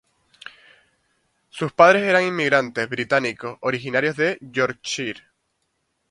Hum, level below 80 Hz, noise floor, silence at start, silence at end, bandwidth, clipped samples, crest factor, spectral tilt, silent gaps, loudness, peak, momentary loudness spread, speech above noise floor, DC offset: none; -64 dBFS; -72 dBFS; 1.55 s; 1 s; 11.5 kHz; under 0.1%; 22 dB; -4.5 dB/octave; none; -20 LUFS; 0 dBFS; 23 LU; 52 dB; under 0.1%